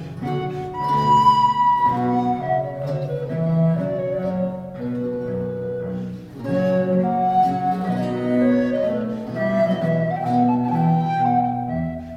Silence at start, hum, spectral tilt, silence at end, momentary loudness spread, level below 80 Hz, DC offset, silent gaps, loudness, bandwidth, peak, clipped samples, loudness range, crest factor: 0 s; none; -8.5 dB/octave; 0 s; 10 LU; -50 dBFS; under 0.1%; none; -21 LUFS; 8.6 kHz; -6 dBFS; under 0.1%; 5 LU; 16 dB